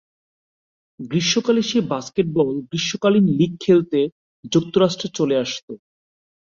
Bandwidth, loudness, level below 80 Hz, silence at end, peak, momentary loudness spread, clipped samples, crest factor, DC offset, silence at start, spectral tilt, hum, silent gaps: 7.6 kHz; -20 LUFS; -60 dBFS; 0.75 s; -4 dBFS; 10 LU; under 0.1%; 18 dB; under 0.1%; 1 s; -5.5 dB/octave; none; 4.12-4.43 s, 5.63-5.68 s